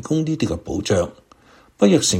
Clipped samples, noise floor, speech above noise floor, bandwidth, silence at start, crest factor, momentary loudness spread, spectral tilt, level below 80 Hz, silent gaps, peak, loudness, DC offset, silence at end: under 0.1%; -51 dBFS; 32 dB; 16 kHz; 0 s; 18 dB; 9 LU; -5 dB/octave; -44 dBFS; none; -2 dBFS; -20 LUFS; under 0.1%; 0 s